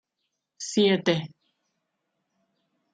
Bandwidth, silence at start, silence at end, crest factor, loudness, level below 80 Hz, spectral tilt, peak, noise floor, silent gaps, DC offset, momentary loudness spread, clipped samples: 9.4 kHz; 0.6 s; 1.65 s; 20 dB; -24 LUFS; -74 dBFS; -4.5 dB/octave; -10 dBFS; -81 dBFS; none; under 0.1%; 17 LU; under 0.1%